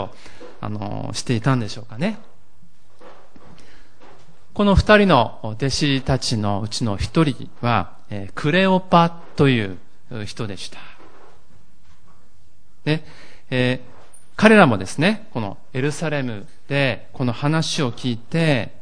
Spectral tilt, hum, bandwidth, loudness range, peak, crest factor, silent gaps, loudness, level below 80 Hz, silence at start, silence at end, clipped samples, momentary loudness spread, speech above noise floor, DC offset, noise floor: -5.5 dB/octave; none; 10.5 kHz; 10 LU; 0 dBFS; 22 dB; none; -20 LUFS; -38 dBFS; 0 s; 0.15 s; under 0.1%; 19 LU; 38 dB; 3%; -57 dBFS